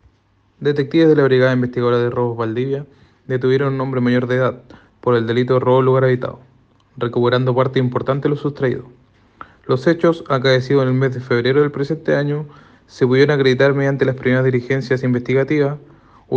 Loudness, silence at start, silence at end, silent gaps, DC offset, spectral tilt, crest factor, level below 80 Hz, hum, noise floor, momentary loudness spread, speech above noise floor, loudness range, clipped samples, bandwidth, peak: -17 LUFS; 0.6 s; 0 s; none; under 0.1%; -8 dB/octave; 16 dB; -56 dBFS; none; -58 dBFS; 9 LU; 42 dB; 3 LU; under 0.1%; 7 kHz; -2 dBFS